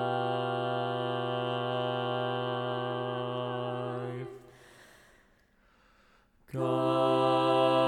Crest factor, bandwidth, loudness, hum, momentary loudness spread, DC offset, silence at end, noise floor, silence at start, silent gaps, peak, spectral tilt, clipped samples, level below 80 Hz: 16 dB; 15.5 kHz; -31 LUFS; none; 11 LU; under 0.1%; 0 s; -65 dBFS; 0 s; none; -14 dBFS; -7 dB/octave; under 0.1%; -72 dBFS